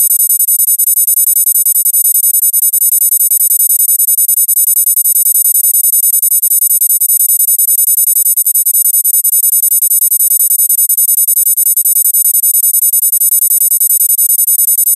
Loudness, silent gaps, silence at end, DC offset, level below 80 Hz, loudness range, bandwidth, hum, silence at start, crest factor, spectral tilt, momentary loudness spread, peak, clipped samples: -6 LUFS; none; 0 s; under 0.1%; -76 dBFS; 0 LU; 16.5 kHz; none; 0 s; 10 dB; 7.5 dB/octave; 1 LU; 0 dBFS; under 0.1%